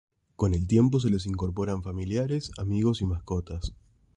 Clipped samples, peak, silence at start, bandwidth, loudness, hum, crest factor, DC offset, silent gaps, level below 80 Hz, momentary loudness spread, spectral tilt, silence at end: under 0.1%; -10 dBFS; 0.4 s; 10.5 kHz; -28 LUFS; none; 16 dB; under 0.1%; none; -40 dBFS; 10 LU; -7.5 dB/octave; 0.45 s